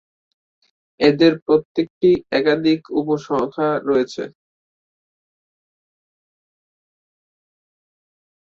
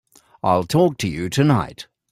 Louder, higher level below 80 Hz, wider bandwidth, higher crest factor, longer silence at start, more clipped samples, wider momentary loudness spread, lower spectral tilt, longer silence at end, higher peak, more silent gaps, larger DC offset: about the same, -18 LUFS vs -19 LUFS; second, -60 dBFS vs -50 dBFS; second, 7.4 kHz vs 15.5 kHz; about the same, 20 dB vs 18 dB; first, 1 s vs 0.45 s; neither; about the same, 9 LU vs 11 LU; about the same, -6.5 dB/octave vs -6.5 dB/octave; first, 4.15 s vs 0.3 s; about the same, -2 dBFS vs -4 dBFS; first, 1.42-1.46 s, 1.65-1.75 s, 1.90-2.01 s vs none; neither